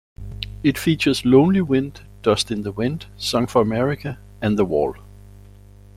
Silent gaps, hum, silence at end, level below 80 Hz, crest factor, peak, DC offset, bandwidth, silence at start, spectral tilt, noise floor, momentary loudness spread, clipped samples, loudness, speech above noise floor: none; 50 Hz at -40 dBFS; 0.85 s; -42 dBFS; 18 dB; -2 dBFS; under 0.1%; 16.5 kHz; 0.2 s; -6 dB/octave; -44 dBFS; 14 LU; under 0.1%; -20 LUFS; 25 dB